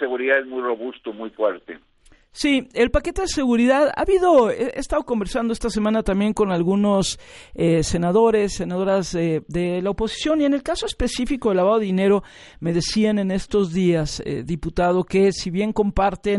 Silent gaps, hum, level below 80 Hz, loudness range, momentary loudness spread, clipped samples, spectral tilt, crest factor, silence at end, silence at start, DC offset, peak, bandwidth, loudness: none; none; -38 dBFS; 2 LU; 9 LU; under 0.1%; -5.5 dB/octave; 16 dB; 0 s; 0 s; under 0.1%; -4 dBFS; 11.5 kHz; -21 LUFS